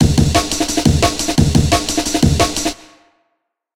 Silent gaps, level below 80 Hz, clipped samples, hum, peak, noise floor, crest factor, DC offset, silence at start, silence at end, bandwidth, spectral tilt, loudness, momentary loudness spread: none; -26 dBFS; under 0.1%; none; 0 dBFS; -70 dBFS; 16 dB; 0.9%; 0 s; 0.9 s; 17 kHz; -4.5 dB/octave; -15 LUFS; 5 LU